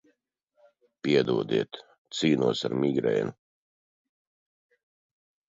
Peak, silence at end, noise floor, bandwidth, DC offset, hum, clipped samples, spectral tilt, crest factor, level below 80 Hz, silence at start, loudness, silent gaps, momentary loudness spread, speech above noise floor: -10 dBFS; 2.15 s; -73 dBFS; 7.8 kHz; under 0.1%; none; under 0.1%; -6 dB/octave; 20 dB; -70 dBFS; 1.05 s; -27 LUFS; 1.98-2.05 s; 12 LU; 48 dB